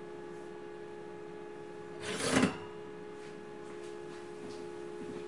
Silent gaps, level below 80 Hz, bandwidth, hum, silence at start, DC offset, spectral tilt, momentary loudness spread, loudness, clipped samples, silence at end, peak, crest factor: none; -68 dBFS; 11.5 kHz; none; 0 s; 0.2%; -4 dB/octave; 16 LU; -39 LUFS; under 0.1%; 0 s; -12 dBFS; 28 dB